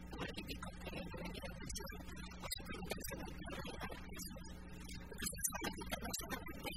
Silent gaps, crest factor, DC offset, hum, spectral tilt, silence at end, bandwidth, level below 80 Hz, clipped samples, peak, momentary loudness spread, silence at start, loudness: none; 24 dB; 0.1%; none; -3 dB/octave; 0 s; 16 kHz; -54 dBFS; under 0.1%; -22 dBFS; 10 LU; 0 s; -46 LUFS